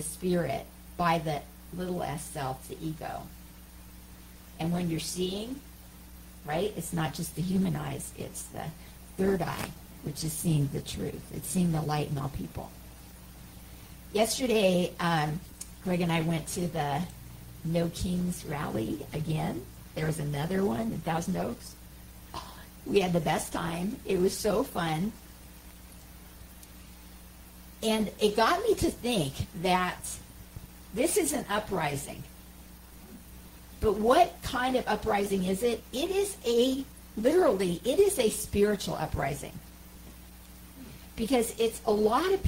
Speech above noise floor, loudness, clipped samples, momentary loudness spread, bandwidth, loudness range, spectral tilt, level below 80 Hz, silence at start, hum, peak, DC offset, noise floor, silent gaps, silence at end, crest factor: 20 dB; -30 LUFS; under 0.1%; 23 LU; 16 kHz; 7 LU; -5 dB/octave; -50 dBFS; 0 s; none; -10 dBFS; under 0.1%; -49 dBFS; none; 0 s; 20 dB